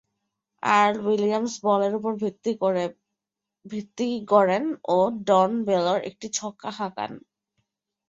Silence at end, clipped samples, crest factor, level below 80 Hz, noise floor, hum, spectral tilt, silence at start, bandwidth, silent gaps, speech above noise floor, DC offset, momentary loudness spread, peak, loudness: 0.9 s; under 0.1%; 20 dB; -70 dBFS; -86 dBFS; none; -4.5 dB/octave; 0.65 s; 8 kHz; none; 63 dB; under 0.1%; 13 LU; -4 dBFS; -24 LUFS